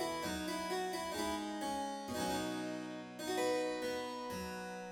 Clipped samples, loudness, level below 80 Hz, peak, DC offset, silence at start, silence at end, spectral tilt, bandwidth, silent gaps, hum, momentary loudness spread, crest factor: under 0.1%; -40 LUFS; -64 dBFS; -26 dBFS; under 0.1%; 0 s; 0 s; -3.5 dB/octave; over 20 kHz; none; none; 7 LU; 14 dB